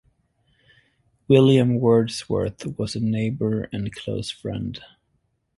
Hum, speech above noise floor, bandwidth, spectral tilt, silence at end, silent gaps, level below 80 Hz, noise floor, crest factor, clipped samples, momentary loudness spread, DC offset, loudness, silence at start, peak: none; 49 dB; 11.5 kHz; -7 dB/octave; 0.7 s; none; -50 dBFS; -70 dBFS; 20 dB; under 0.1%; 13 LU; under 0.1%; -22 LUFS; 1.3 s; -2 dBFS